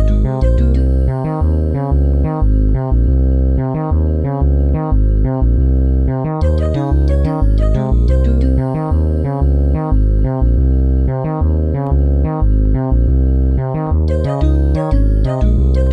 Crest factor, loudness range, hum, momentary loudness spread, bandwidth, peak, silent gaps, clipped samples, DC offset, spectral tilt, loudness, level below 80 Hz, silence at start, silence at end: 10 dB; 0 LU; none; 3 LU; 4.7 kHz; -2 dBFS; none; under 0.1%; under 0.1%; -10.5 dB/octave; -15 LUFS; -14 dBFS; 0 s; 0 s